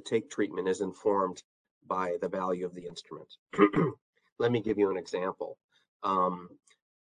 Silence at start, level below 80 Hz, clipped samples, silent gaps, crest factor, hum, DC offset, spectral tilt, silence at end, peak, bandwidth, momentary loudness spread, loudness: 0.05 s; -68 dBFS; under 0.1%; 1.44-1.65 s, 1.71-1.81 s, 3.39-3.46 s, 4.01-4.13 s, 4.32-4.36 s, 5.64-5.69 s, 5.88-6.00 s; 24 dB; none; under 0.1%; -6.5 dB/octave; 0.55 s; -6 dBFS; 10 kHz; 17 LU; -31 LUFS